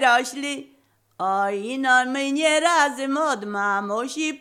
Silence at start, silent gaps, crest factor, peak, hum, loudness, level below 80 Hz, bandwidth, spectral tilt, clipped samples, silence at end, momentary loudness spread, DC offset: 0 s; none; 16 dB; -6 dBFS; none; -22 LUFS; -80 dBFS; 16 kHz; -2 dB/octave; under 0.1%; 0.05 s; 10 LU; under 0.1%